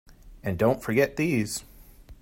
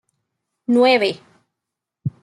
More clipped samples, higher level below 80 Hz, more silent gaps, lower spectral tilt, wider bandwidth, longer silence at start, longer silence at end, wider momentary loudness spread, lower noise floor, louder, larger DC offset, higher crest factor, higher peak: neither; first, -50 dBFS vs -66 dBFS; neither; about the same, -5.5 dB/octave vs -6 dB/octave; first, 16.5 kHz vs 12 kHz; second, 0.1 s vs 0.7 s; about the same, 0.1 s vs 0.15 s; second, 11 LU vs 18 LU; second, -49 dBFS vs -83 dBFS; second, -26 LUFS vs -16 LUFS; neither; about the same, 18 dB vs 18 dB; second, -8 dBFS vs -4 dBFS